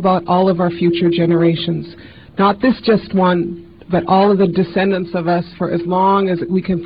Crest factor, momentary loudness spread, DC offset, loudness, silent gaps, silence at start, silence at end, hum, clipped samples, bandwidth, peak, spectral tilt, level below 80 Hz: 14 dB; 7 LU; 0.2%; -15 LUFS; none; 0 s; 0 s; none; under 0.1%; 5.2 kHz; -2 dBFS; -11 dB/octave; -48 dBFS